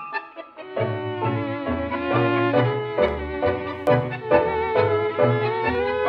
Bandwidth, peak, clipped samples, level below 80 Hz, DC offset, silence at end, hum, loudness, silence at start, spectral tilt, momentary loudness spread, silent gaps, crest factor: 5.8 kHz; -4 dBFS; under 0.1%; -46 dBFS; under 0.1%; 0 s; none; -23 LUFS; 0 s; -8.5 dB/octave; 7 LU; none; 18 dB